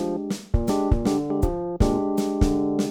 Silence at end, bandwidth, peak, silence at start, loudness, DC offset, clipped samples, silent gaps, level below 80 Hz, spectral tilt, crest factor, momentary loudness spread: 0 s; 19.5 kHz; -6 dBFS; 0 s; -24 LUFS; under 0.1%; under 0.1%; none; -28 dBFS; -7 dB/octave; 16 dB; 4 LU